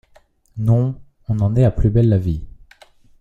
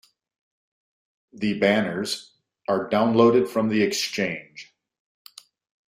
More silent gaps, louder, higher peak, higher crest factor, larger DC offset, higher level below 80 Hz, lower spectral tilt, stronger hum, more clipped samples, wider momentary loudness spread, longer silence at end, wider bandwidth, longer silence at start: neither; first, -18 LUFS vs -22 LUFS; about the same, -4 dBFS vs -4 dBFS; about the same, 16 dB vs 20 dB; neither; first, -32 dBFS vs -66 dBFS; first, -10.5 dB/octave vs -5 dB/octave; neither; neither; second, 13 LU vs 16 LU; second, 0.7 s vs 1.25 s; second, 4.3 kHz vs 15.5 kHz; second, 0.55 s vs 1.35 s